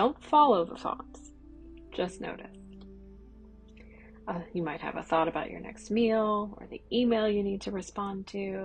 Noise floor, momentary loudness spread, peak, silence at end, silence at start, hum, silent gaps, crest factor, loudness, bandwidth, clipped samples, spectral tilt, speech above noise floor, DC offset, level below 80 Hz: -52 dBFS; 24 LU; -12 dBFS; 0 s; 0 s; none; none; 20 dB; -30 LUFS; 9.6 kHz; under 0.1%; -6 dB/octave; 22 dB; under 0.1%; -54 dBFS